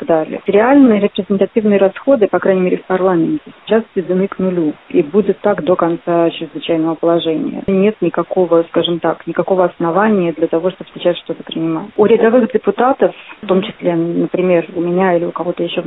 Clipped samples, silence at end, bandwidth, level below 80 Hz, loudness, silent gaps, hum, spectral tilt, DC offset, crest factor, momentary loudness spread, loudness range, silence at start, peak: under 0.1%; 0 s; 4 kHz; -56 dBFS; -14 LUFS; none; none; -11.5 dB/octave; 0.1%; 14 dB; 7 LU; 3 LU; 0 s; 0 dBFS